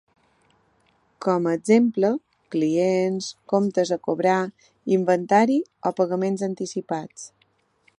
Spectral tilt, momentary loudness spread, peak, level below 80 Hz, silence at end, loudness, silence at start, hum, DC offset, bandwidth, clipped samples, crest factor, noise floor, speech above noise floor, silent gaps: -6 dB/octave; 12 LU; -4 dBFS; -72 dBFS; 0.7 s; -23 LUFS; 1.2 s; none; under 0.1%; 11 kHz; under 0.1%; 20 dB; -65 dBFS; 44 dB; none